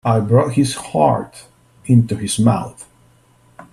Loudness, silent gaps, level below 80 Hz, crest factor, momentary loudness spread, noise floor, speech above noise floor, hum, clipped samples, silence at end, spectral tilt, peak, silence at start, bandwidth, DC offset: -16 LUFS; none; -50 dBFS; 16 dB; 14 LU; -52 dBFS; 37 dB; none; under 0.1%; 0.1 s; -6.5 dB/octave; 0 dBFS; 0.05 s; 13 kHz; under 0.1%